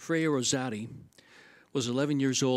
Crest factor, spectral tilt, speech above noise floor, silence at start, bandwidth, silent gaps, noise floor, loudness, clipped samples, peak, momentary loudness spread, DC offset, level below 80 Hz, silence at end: 16 dB; -4 dB/octave; 28 dB; 0 s; 14.5 kHz; none; -57 dBFS; -30 LUFS; under 0.1%; -14 dBFS; 14 LU; under 0.1%; -72 dBFS; 0 s